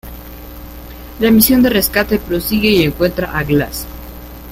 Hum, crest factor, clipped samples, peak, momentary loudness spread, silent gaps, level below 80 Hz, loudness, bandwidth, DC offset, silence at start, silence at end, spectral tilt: 60 Hz at -30 dBFS; 16 dB; under 0.1%; 0 dBFS; 23 LU; none; -32 dBFS; -13 LUFS; 16.5 kHz; under 0.1%; 0.05 s; 0 s; -4.5 dB/octave